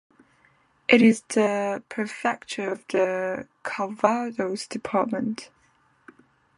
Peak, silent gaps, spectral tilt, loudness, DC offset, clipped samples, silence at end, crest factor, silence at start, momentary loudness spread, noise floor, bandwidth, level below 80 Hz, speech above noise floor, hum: -2 dBFS; none; -5 dB/octave; -25 LUFS; under 0.1%; under 0.1%; 1.15 s; 24 dB; 0.9 s; 13 LU; -63 dBFS; 11.5 kHz; -70 dBFS; 39 dB; none